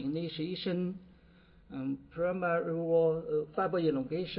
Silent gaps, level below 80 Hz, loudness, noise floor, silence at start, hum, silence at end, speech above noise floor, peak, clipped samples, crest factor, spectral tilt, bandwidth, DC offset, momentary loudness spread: none; -64 dBFS; -33 LUFS; -60 dBFS; 0 s; none; 0 s; 28 dB; -18 dBFS; under 0.1%; 14 dB; -10.5 dB/octave; 5.6 kHz; under 0.1%; 10 LU